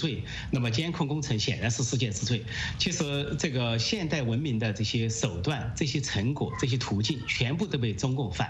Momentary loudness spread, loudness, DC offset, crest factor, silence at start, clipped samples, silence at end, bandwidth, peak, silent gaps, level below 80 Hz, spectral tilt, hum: 3 LU; -29 LUFS; under 0.1%; 18 dB; 0 s; under 0.1%; 0 s; 8.6 kHz; -10 dBFS; none; -48 dBFS; -4.5 dB/octave; none